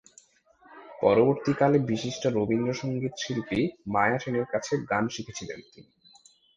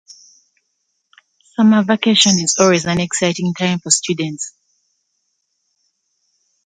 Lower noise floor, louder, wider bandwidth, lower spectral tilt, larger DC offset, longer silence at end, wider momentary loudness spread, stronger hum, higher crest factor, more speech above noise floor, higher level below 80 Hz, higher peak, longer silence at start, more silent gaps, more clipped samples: second, -60 dBFS vs -70 dBFS; second, -27 LUFS vs -15 LUFS; about the same, 9.6 kHz vs 9.6 kHz; first, -6 dB/octave vs -3.5 dB/octave; neither; second, 0.75 s vs 2.15 s; about the same, 13 LU vs 12 LU; neither; about the same, 20 dB vs 18 dB; second, 34 dB vs 55 dB; about the same, -60 dBFS vs -56 dBFS; second, -6 dBFS vs 0 dBFS; second, 0.7 s vs 1.6 s; neither; neither